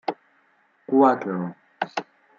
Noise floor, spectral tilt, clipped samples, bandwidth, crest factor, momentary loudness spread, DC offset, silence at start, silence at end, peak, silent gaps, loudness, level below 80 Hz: -63 dBFS; -7.5 dB/octave; under 0.1%; 7.2 kHz; 20 dB; 16 LU; under 0.1%; 0.1 s; 0.35 s; -6 dBFS; none; -24 LUFS; -80 dBFS